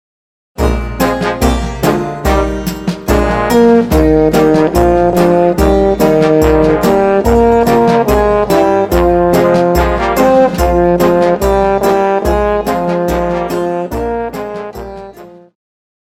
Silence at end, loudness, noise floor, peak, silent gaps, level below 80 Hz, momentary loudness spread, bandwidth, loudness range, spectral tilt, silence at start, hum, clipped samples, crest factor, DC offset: 0.7 s; -11 LUFS; -34 dBFS; 0 dBFS; none; -22 dBFS; 8 LU; 17 kHz; 5 LU; -6.5 dB/octave; 0.6 s; none; under 0.1%; 10 dB; under 0.1%